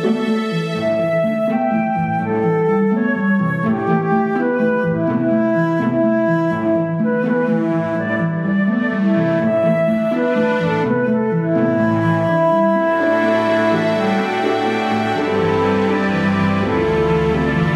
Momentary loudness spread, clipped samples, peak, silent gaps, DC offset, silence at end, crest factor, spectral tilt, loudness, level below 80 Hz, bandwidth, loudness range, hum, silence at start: 3 LU; under 0.1%; -4 dBFS; none; under 0.1%; 0 s; 12 dB; -8 dB/octave; -17 LUFS; -44 dBFS; 9.8 kHz; 2 LU; none; 0 s